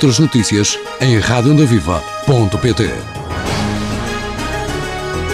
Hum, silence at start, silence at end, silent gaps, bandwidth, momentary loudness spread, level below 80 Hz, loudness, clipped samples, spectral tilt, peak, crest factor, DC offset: none; 0 s; 0 s; none; 15 kHz; 9 LU; -30 dBFS; -15 LUFS; under 0.1%; -5 dB/octave; -2 dBFS; 14 dB; 0.1%